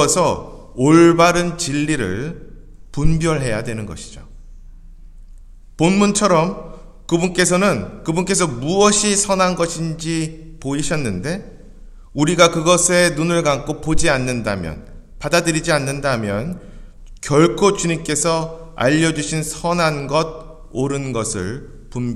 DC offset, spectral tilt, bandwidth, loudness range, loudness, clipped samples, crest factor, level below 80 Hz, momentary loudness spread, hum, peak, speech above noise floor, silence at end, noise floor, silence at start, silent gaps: under 0.1%; -4.5 dB/octave; 14 kHz; 5 LU; -17 LUFS; under 0.1%; 18 dB; -36 dBFS; 17 LU; none; 0 dBFS; 22 dB; 0 s; -39 dBFS; 0 s; none